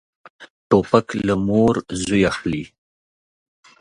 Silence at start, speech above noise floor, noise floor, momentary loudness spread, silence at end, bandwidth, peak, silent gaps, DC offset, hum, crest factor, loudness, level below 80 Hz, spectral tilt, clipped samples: 0.4 s; over 72 dB; under -90 dBFS; 10 LU; 1.15 s; 11 kHz; 0 dBFS; 0.50-0.70 s; under 0.1%; none; 20 dB; -19 LUFS; -46 dBFS; -6 dB/octave; under 0.1%